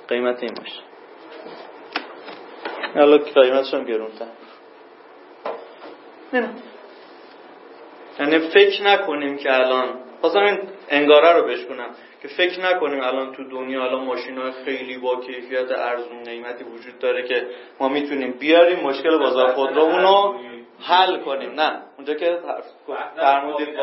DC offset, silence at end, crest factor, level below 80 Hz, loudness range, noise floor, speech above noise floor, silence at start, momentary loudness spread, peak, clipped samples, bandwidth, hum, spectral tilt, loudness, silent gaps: under 0.1%; 0 s; 20 dB; -86 dBFS; 9 LU; -45 dBFS; 26 dB; 0.1 s; 21 LU; 0 dBFS; under 0.1%; 5.8 kHz; none; -7 dB/octave; -19 LUFS; none